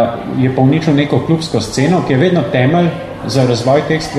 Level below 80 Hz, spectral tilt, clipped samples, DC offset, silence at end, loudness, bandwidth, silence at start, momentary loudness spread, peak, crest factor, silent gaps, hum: -42 dBFS; -6.5 dB/octave; under 0.1%; under 0.1%; 0 s; -13 LUFS; 12.5 kHz; 0 s; 5 LU; 0 dBFS; 12 dB; none; none